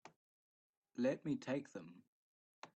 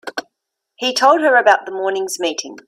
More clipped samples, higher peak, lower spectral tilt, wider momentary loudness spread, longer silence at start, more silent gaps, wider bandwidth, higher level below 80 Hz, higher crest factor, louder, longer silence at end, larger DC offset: neither; second, -26 dBFS vs 0 dBFS; first, -6.5 dB/octave vs -1 dB/octave; first, 19 LU vs 11 LU; about the same, 0.05 s vs 0.05 s; first, 0.16-0.82 s, 2.07-2.62 s vs none; second, 8.4 kHz vs 16 kHz; second, -84 dBFS vs -70 dBFS; about the same, 20 dB vs 16 dB; second, -42 LUFS vs -15 LUFS; about the same, 0.1 s vs 0.1 s; neither